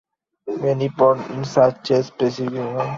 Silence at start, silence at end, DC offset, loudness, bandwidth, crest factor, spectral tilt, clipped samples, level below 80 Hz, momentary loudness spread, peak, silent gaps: 0.45 s; 0 s; under 0.1%; -20 LUFS; 7.6 kHz; 18 dB; -7 dB/octave; under 0.1%; -60 dBFS; 8 LU; -2 dBFS; none